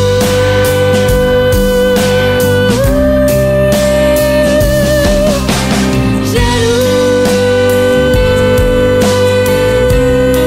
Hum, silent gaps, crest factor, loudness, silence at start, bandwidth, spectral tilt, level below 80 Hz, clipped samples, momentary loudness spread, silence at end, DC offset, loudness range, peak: none; none; 8 dB; -10 LUFS; 0 s; 16.5 kHz; -5.5 dB/octave; -20 dBFS; under 0.1%; 2 LU; 0 s; under 0.1%; 1 LU; 0 dBFS